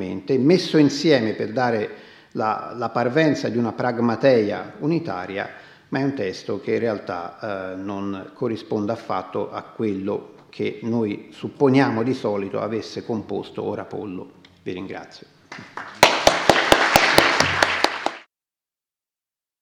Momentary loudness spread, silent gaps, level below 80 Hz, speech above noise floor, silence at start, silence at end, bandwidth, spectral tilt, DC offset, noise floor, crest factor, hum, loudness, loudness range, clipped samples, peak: 16 LU; none; -52 dBFS; over 67 dB; 0 s; 1.4 s; 16.5 kHz; -4.5 dB/octave; under 0.1%; under -90 dBFS; 22 dB; none; -21 LUFS; 10 LU; under 0.1%; 0 dBFS